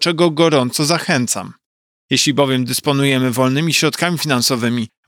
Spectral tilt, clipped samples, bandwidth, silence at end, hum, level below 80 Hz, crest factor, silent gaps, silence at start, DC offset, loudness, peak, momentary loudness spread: -4 dB/octave; under 0.1%; 18.5 kHz; 0.2 s; none; -68 dBFS; 14 dB; 1.66-2.09 s; 0 s; under 0.1%; -16 LUFS; -2 dBFS; 5 LU